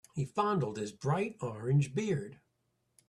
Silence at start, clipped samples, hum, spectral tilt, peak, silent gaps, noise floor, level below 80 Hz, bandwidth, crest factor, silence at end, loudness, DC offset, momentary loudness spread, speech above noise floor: 0.15 s; under 0.1%; none; -7 dB/octave; -16 dBFS; none; -79 dBFS; -68 dBFS; 11.5 kHz; 18 dB; 0.75 s; -33 LUFS; under 0.1%; 7 LU; 46 dB